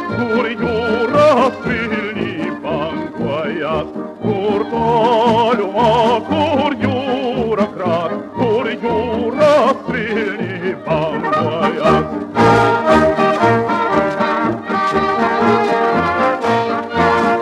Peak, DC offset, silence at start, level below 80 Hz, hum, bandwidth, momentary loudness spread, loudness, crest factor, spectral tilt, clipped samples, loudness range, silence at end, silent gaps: 0 dBFS; under 0.1%; 0 s; -46 dBFS; none; 12 kHz; 9 LU; -16 LUFS; 14 dB; -6.5 dB/octave; under 0.1%; 3 LU; 0 s; none